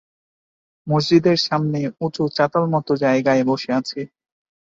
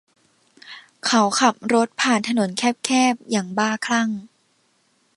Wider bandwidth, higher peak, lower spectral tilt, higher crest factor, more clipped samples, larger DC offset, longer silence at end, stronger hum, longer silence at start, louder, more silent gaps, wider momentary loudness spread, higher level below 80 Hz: second, 7.8 kHz vs 11.5 kHz; second, -4 dBFS vs 0 dBFS; first, -6.5 dB/octave vs -3 dB/octave; second, 16 dB vs 22 dB; neither; neither; second, 0.65 s vs 0.9 s; neither; first, 0.85 s vs 0.65 s; about the same, -19 LUFS vs -20 LUFS; neither; about the same, 11 LU vs 11 LU; first, -60 dBFS vs -70 dBFS